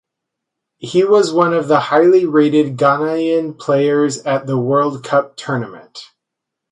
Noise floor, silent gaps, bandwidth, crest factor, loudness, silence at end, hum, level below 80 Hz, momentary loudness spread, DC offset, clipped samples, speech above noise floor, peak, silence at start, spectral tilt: -80 dBFS; none; 11 kHz; 14 dB; -15 LUFS; 0.7 s; none; -64 dBFS; 11 LU; under 0.1%; under 0.1%; 65 dB; 0 dBFS; 0.8 s; -6 dB/octave